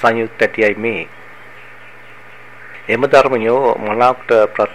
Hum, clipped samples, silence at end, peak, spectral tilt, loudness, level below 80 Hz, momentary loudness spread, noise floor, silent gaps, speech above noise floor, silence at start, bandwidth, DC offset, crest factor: none; under 0.1%; 0 s; 0 dBFS; -5.5 dB/octave; -14 LUFS; -54 dBFS; 13 LU; -39 dBFS; none; 25 dB; 0 s; 12.5 kHz; 1%; 16 dB